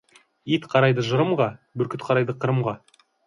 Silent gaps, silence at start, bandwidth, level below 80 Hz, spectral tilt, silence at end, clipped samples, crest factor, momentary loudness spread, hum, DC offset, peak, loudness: none; 0.45 s; 10.5 kHz; -64 dBFS; -7 dB/octave; 0.5 s; under 0.1%; 18 dB; 10 LU; none; under 0.1%; -4 dBFS; -23 LUFS